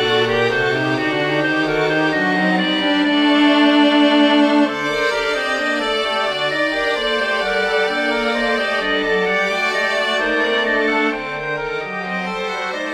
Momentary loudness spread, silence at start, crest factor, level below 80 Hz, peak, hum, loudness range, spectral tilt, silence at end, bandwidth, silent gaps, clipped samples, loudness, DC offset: 9 LU; 0 s; 14 dB; -48 dBFS; -2 dBFS; none; 3 LU; -4.5 dB/octave; 0 s; 12.5 kHz; none; under 0.1%; -17 LUFS; under 0.1%